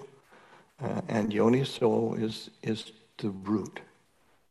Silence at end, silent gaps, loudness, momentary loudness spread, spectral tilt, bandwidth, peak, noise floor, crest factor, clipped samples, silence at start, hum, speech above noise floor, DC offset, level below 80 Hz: 0.65 s; none; -30 LUFS; 14 LU; -6.5 dB/octave; 12 kHz; -10 dBFS; -68 dBFS; 20 dB; under 0.1%; 0 s; none; 39 dB; under 0.1%; -68 dBFS